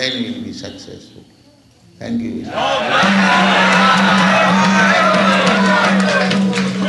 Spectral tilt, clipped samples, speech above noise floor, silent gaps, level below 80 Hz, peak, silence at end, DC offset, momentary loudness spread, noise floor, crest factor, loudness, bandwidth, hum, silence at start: -4.5 dB/octave; under 0.1%; 33 dB; none; -54 dBFS; 0 dBFS; 0 s; under 0.1%; 15 LU; -48 dBFS; 14 dB; -12 LUFS; 11.5 kHz; none; 0 s